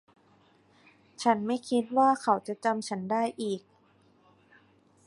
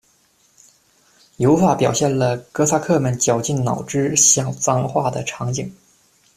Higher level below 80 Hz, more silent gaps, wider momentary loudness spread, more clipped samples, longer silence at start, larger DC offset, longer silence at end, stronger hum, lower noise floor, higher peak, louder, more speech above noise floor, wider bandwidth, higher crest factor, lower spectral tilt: second, -78 dBFS vs -52 dBFS; neither; about the same, 9 LU vs 11 LU; neither; second, 1.2 s vs 1.4 s; neither; first, 1.45 s vs 0.65 s; neither; first, -64 dBFS vs -59 dBFS; second, -10 dBFS vs 0 dBFS; second, -28 LUFS vs -18 LUFS; second, 36 dB vs 41 dB; second, 11.5 kHz vs 15 kHz; about the same, 22 dB vs 18 dB; about the same, -5 dB/octave vs -4.5 dB/octave